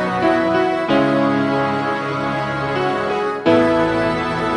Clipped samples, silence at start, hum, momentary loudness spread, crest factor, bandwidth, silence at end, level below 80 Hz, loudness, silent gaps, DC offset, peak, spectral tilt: under 0.1%; 0 s; none; 6 LU; 16 dB; 11 kHz; 0 s; -46 dBFS; -18 LUFS; none; under 0.1%; -2 dBFS; -6.5 dB/octave